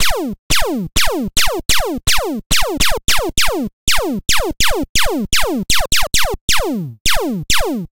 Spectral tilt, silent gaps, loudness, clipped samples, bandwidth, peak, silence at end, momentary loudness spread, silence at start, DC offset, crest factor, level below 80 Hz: -2 dB/octave; 0.39-0.50 s, 2.46-2.50 s, 3.73-3.87 s, 4.89-4.95 s, 6.41-6.48 s, 7.00-7.05 s; -16 LUFS; under 0.1%; 17 kHz; 0 dBFS; 0.05 s; 3 LU; 0 s; 8%; 14 dB; -26 dBFS